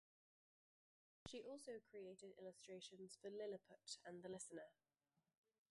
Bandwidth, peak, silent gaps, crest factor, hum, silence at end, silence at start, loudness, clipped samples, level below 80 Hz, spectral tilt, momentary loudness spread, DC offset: 11.5 kHz; -38 dBFS; none; 20 dB; none; 1 s; 1.25 s; -57 LUFS; under 0.1%; -88 dBFS; -3.5 dB/octave; 7 LU; under 0.1%